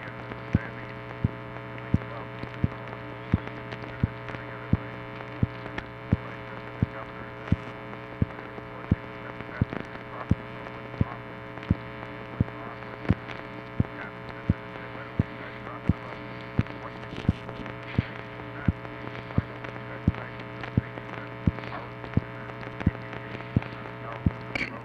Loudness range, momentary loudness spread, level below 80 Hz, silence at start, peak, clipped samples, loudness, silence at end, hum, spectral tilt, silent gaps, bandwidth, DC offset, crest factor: 1 LU; 8 LU; -44 dBFS; 0 s; -8 dBFS; under 0.1%; -33 LUFS; 0 s; none; -8.5 dB/octave; none; 6.8 kHz; under 0.1%; 24 dB